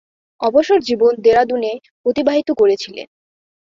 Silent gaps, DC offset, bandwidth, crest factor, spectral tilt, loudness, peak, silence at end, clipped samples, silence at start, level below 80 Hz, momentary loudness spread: 1.91-2.04 s; under 0.1%; 7.4 kHz; 14 dB; -4.5 dB/octave; -16 LUFS; -2 dBFS; 0.7 s; under 0.1%; 0.4 s; -56 dBFS; 9 LU